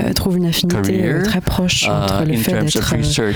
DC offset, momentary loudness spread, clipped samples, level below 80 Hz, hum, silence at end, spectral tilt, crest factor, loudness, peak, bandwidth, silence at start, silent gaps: 0.4%; 2 LU; under 0.1%; -32 dBFS; none; 0 s; -4.5 dB/octave; 16 dB; -16 LUFS; 0 dBFS; over 20 kHz; 0 s; none